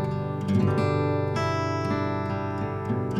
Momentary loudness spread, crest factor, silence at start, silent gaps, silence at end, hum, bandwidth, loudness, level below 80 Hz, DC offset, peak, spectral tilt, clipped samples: 6 LU; 14 dB; 0 s; none; 0 s; none; 10 kHz; -26 LUFS; -54 dBFS; under 0.1%; -10 dBFS; -8 dB/octave; under 0.1%